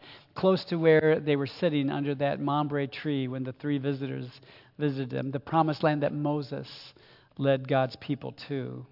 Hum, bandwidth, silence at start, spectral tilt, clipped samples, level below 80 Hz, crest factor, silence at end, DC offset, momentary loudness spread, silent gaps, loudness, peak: none; 5.8 kHz; 0.05 s; -9 dB/octave; under 0.1%; -70 dBFS; 20 dB; 0.05 s; under 0.1%; 11 LU; none; -28 LUFS; -10 dBFS